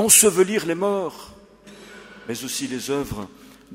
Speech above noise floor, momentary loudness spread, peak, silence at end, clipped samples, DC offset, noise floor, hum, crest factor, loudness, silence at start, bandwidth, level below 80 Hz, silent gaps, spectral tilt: 25 dB; 27 LU; 0 dBFS; 0 s; under 0.1%; under 0.1%; -46 dBFS; none; 22 dB; -20 LUFS; 0 s; 16 kHz; -52 dBFS; none; -2.5 dB/octave